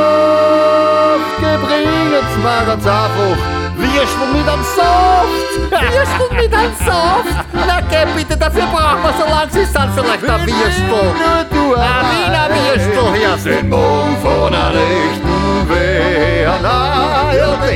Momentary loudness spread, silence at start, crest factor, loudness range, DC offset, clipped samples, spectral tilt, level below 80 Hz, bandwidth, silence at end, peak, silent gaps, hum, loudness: 4 LU; 0 s; 12 dB; 1 LU; under 0.1%; under 0.1%; -5.5 dB/octave; -24 dBFS; 17.5 kHz; 0 s; 0 dBFS; none; none; -13 LUFS